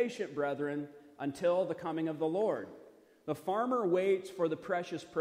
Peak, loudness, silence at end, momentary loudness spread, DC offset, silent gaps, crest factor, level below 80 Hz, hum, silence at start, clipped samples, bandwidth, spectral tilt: -20 dBFS; -34 LUFS; 0 s; 11 LU; under 0.1%; none; 14 dB; -78 dBFS; none; 0 s; under 0.1%; 15.5 kHz; -6.5 dB/octave